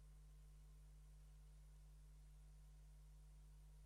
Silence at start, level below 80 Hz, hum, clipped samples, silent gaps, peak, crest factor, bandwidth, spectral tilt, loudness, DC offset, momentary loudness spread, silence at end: 0 s; -64 dBFS; 50 Hz at -65 dBFS; under 0.1%; none; -58 dBFS; 6 dB; 12.5 kHz; -5.5 dB/octave; -67 LUFS; under 0.1%; 0 LU; 0 s